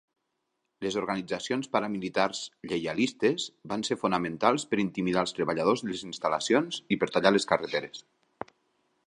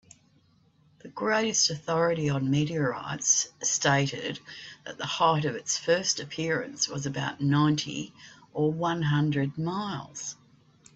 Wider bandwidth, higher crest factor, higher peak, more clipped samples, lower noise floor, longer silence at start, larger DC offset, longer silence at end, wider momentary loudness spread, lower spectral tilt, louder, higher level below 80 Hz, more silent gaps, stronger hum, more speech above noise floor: first, 11 kHz vs 8.2 kHz; about the same, 24 dB vs 20 dB; first, -4 dBFS vs -10 dBFS; neither; first, -80 dBFS vs -64 dBFS; second, 0.8 s vs 1.05 s; neither; first, 1.05 s vs 0.6 s; second, 10 LU vs 14 LU; about the same, -4.5 dB/octave vs -3.5 dB/octave; about the same, -29 LUFS vs -27 LUFS; about the same, -66 dBFS vs -64 dBFS; neither; neither; first, 52 dB vs 36 dB